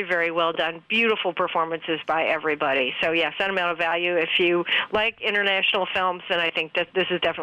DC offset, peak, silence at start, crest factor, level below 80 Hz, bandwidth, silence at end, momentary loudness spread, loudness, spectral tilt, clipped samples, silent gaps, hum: under 0.1%; -10 dBFS; 0 s; 14 dB; -62 dBFS; 10 kHz; 0 s; 4 LU; -22 LUFS; -5 dB/octave; under 0.1%; none; none